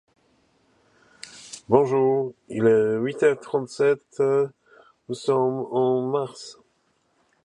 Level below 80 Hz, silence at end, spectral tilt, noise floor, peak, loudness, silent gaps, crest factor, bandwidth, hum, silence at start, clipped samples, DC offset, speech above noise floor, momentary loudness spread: -68 dBFS; 0.9 s; -6.5 dB/octave; -68 dBFS; -4 dBFS; -23 LUFS; none; 20 dB; 10.5 kHz; none; 1.35 s; under 0.1%; under 0.1%; 46 dB; 20 LU